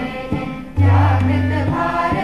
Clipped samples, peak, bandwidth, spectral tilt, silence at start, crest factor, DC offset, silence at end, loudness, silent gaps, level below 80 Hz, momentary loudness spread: under 0.1%; -4 dBFS; 6 kHz; -8.5 dB/octave; 0 s; 12 dB; 0.8%; 0 s; -17 LUFS; none; -36 dBFS; 10 LU